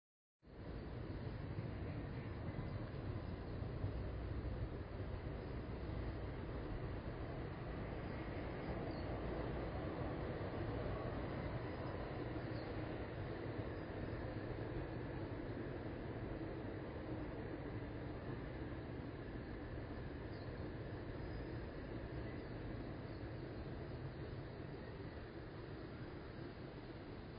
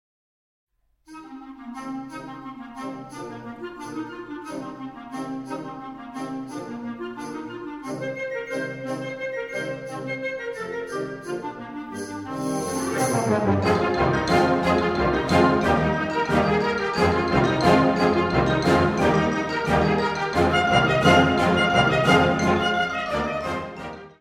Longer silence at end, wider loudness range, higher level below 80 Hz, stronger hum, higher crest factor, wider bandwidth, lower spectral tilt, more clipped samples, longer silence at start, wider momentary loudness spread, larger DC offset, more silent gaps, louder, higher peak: about the same, 0 s vs 0.1 s; second, 4 LU vs 16 LU; second, -54 dBFS vs -44 dBFS; neither; about the same, 16 dB vs 20 dB; second, 5 kHz vs 16 kHz; first, -7 dB/octave vs -5.5 dB/octave; neither; second, 0.45 s vs 1.1 s; second, 6 LU vs 17 LU; neither; neither; second, -48 LUFS vs -22 LUFS; second, -30 dBFS vs -4 dBFS